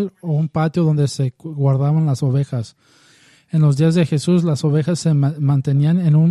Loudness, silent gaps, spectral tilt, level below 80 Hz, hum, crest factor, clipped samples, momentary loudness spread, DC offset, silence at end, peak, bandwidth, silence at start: -17 LUFS; none; -8 dB/octave; -56 dBFS; none; 12 dB; under 0.1%; 8 LU; under 0.1%; 0 s; -4 dBFS; 11.5 kHz; 0 s